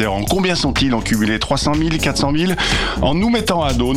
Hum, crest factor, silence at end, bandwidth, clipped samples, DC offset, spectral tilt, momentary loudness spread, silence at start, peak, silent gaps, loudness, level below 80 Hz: none; 12 dB; 0 s; 16 kHz; under 0.1%; under 0.1%; -4.5 dB/octave; 1 LU; 0 s; -4 dBFS; none; -17 LUFS; -28 dBFS